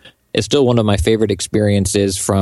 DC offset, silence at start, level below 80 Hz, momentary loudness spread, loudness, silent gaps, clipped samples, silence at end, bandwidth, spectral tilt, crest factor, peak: under 0.1%; 0.05 s; -34 dBFS; 3 LU; -15 LUFS; none; under 0.1%; 0 s; 12.5 kHz; -5 dB/octave; 14 dB; 0 dBFS